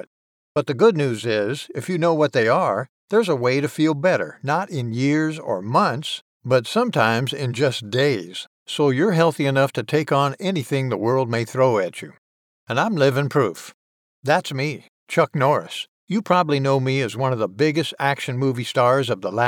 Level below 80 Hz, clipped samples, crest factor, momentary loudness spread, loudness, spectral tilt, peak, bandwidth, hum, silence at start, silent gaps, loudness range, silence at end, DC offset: -72 dBFS; under 0.1%; 18 dB; 9 LU; -21 LUFS; -6 dB/octave; -4 dBFS; 17 kHz; none; 0.55 s; 2.89-3.08 s, 6.21-6.40 s, 8.47-8.66 s, 12.18-12.66 s, 13.74-14.23 s, 14.88-15.07 s, 15.88-16.07 s; 2 LU; 0 s; under 0.1%